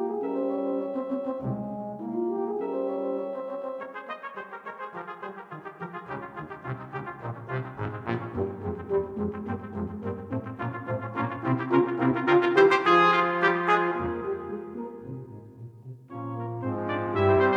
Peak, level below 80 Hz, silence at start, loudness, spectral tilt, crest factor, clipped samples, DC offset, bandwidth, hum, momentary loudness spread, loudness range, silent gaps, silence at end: -8 dBFS; -60 dBFS; 0 s; -28 LUFS; -7.5 dB/octave; 20 dB; under 0.1%; under 0.1%; 7.8 kHz; none; 17 LU; 14 LU; none; 0 s